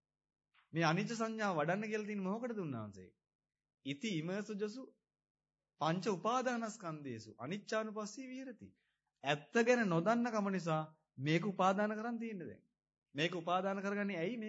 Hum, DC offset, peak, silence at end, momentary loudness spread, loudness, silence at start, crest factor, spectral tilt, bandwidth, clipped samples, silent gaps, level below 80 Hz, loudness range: none; under 0.1%; -18 dBFS; 0 s; 15 LU; -38 LUFS; 0.75 s; 20 dB; -4.5 dB/octave; 7.6 kHz; under 0.1%; 3.35-3.39 s, 5.30-5.35 s, 12.98-13.02 s; -90 dBFS; 8 LU